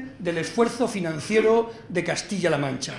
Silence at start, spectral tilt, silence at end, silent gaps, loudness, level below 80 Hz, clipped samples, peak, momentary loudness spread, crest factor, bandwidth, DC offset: 0 s; -5 dB/octave; 0 s; none; -24 LUFS; -58 dBFS; under 0.1%; -8 dBFS; 8 LU; 18 dB; 12 kHz; under 0.1%